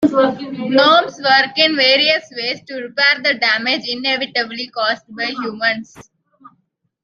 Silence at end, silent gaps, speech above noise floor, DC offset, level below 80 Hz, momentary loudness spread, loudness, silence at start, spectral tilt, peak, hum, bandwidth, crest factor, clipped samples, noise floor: 1.05 s; none; 48 dB; under 0.1%; -64 dBFS; 12 LU; -15 LUFS; 0 s; -3.5 dB/octave; 0 dBFS; none; 7.4 kHz; 16 dB; under 0.1%; -64 dBFS